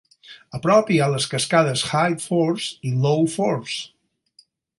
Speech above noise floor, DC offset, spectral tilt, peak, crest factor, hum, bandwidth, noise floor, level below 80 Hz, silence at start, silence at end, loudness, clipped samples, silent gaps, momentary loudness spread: 38 dB; under 0.1%; -5 dB/octave; -4 dBFS; 18 dB; none; 11.5 kHz; -58 dBFS; -62 dBFS; 0.3 s; 0.9 s; -21 LUFS; under 0.1%; none; 10 LU